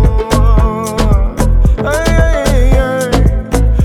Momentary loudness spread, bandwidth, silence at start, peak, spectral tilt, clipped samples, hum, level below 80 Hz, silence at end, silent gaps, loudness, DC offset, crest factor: 3 LU; 13.5 kHz; 0 s; 0 dBFS; -6 dB/octave; under 0.1%; none; -12 dBFS; 0 s; none; -12 LUFS; under 0.1%; 8 dB